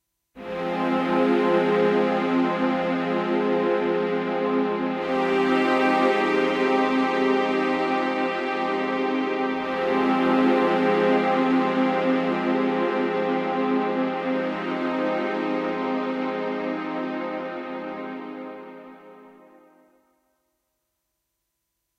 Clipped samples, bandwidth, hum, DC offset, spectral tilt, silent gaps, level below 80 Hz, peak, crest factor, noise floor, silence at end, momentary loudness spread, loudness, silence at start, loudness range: under 0.1%; 8.6 kHz; none; under 0.1%; -6.5 dB/octave; none; -66 dBFS; -8 dBFS; 14 dB; -79 dBFS; 2.7 s; 10 LU; -23 LUFS; 0.35 s; 10 LU